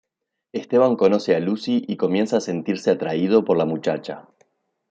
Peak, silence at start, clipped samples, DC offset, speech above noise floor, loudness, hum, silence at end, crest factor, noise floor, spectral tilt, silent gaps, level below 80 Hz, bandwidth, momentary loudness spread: -4 dBFS; 0.55 s; under 0.1%; under 0.1%; 54 dB; -21 LUFS; none; 0.7 s; 18 dB; -74 dBFS; -6.5 dB/octave; none; -68 dBFS; 8 kHz; 12 LU